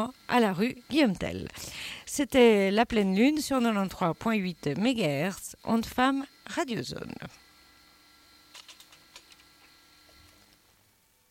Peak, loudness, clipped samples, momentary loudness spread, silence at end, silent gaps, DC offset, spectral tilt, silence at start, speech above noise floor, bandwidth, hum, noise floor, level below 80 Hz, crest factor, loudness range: -10 dBFS; -27 LUFS; under 0.1%; 15 LU; 2.1 s; none; under 0.1%; -5 dB/octave; 0 s; 39 dB; 17 kHz; none; -66 dBFS; -58 dBFS; 20 dB; 14 LU